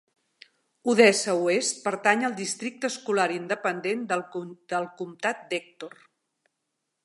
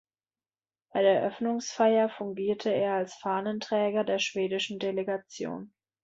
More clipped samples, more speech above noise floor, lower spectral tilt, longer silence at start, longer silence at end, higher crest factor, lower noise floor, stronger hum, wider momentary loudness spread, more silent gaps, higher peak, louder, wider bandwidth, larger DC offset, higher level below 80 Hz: neither; second, 55 dB vs over 62 dB; second, -3 dB/octave vs -4.5 dB/octave; about the same, 0.85 s vs 0.95 s; first, 1.15 s vs 0.4 s; first, 24 dB vs 18 dB; second, -81 dBFS vs under -90 dBFS; neither; first, 16 LU vs 10 LU; neither; first, -4 dBFS vs -12 dBFS; first, -26 LUFS vs -29 LUFS; first, 11.5 kHz vs 7.8 kHz; neither; second, -80 dBFS vs -74 dBFS